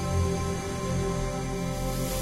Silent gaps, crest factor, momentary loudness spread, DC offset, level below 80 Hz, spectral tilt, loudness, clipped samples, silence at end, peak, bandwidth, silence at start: none; 14 dB; 4 LU; under 0.1%; -36 dBFS; -5.5 dB/octave; -30 LUFS; under 0.1%; 0 s; -16 dBFS; 16 kHz; 0 s